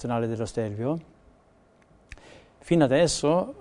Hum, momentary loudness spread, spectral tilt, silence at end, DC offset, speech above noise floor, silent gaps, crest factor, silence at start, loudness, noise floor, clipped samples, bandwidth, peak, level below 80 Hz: none; 9 LU; -5.5 dB/octave; 0 s; under 0.1%; 35 dB; none; 20 dB; 0 s; -25 LUFS; -59 dBFS; under 0.1%; 11 kHz; -6 dBFS; -52 dBFS